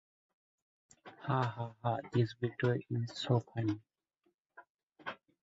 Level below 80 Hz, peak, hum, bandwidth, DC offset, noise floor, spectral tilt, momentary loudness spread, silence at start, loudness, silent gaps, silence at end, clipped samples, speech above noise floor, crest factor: -70 dBFS; -18 dBFS; none; 7.6 kHz; under 0.1%; -80 dBFS; -6 dB/octave; 13 LU; 1.05 s; -36 LUFS; 4.34-4.45 s, 4.70-4.75 s, 4.83-4.90 s; 0.25 s; under 0.1%; 45 dB; 20 dB